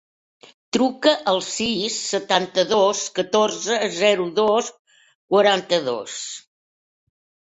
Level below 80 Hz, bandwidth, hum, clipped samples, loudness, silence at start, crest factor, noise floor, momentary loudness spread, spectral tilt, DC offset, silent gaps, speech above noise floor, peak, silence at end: -64 dBFS; 8.4 kHz; none; under 0.1%; -20 LUFS; 0.75 s; 20 dB; under -90 dBFS; 9 LU; -2.5 dB/octave; under 0.1%; 4.79-4.85 s, 5.15-5.28 s; over 70 dB; -2 dBFS; 1.1 s